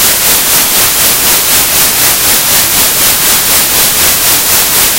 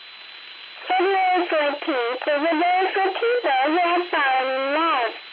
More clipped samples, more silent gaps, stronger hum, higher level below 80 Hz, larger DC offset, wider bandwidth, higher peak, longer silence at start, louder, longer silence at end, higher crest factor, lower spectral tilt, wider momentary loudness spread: first, 2% vs under 0.1%; neither; neither; first, -32 dBFS vs -88 dBFS; neither; first, over 20 kHz vs 5.2 kHz; first, 0 dBFS vs -12 dBFS; about the same, 0 s vs 0 s; first, -5 LUFS vs -21 LUFS; about the same, 0 s vs 0 s; about the same, 8 dB vs 10 dB; second, 0 dB/octave vs -4.5 dB/octave; second, 1 LU vs 16 LU